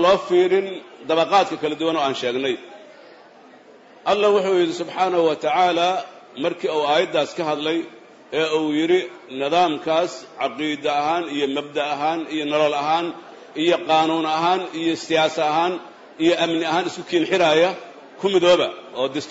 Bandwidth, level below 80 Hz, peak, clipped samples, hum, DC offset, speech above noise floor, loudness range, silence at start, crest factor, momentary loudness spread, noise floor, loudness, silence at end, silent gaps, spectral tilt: 8 kHz; -66 dBFS; -6 dBFS; under 0.1%; none; under 0.1%; 27 dB; 3 LU; 0 s; 16 dB; 10 LU; -47 dBFS; -21 LUFS; 0 s; none; -4.5 dB/octave